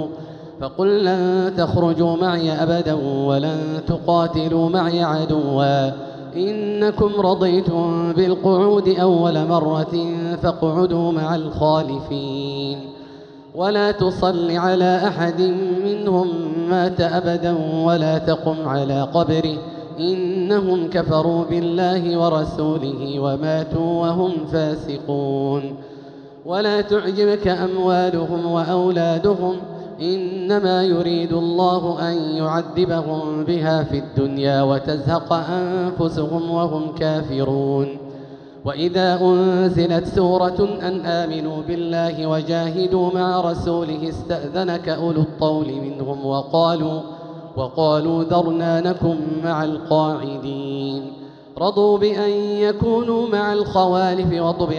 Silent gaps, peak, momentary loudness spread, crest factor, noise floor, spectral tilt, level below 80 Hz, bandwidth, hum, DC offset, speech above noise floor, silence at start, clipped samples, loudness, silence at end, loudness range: none; -4 dBFS; 8 LU; 14 dB; -40 dBFS; -8 dB/octave; -46 dBFS; 7 kHz; none; under 0.1%; 21 dB; 0 s; under 0.1%; -19 LUFS; 0 s; 3 LU